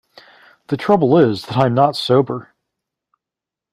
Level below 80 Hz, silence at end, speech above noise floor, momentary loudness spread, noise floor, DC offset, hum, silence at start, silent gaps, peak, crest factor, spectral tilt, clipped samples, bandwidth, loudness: -56 dBFS; 1.3 s; 71 dB; 11 LU; -86 dBFS; under 0.1%; none; 0.7 s; none; -2 dBFS; 16 dB; -7.5 dB/octave; under 0.1%; 14.5 kHz; -16 LUFS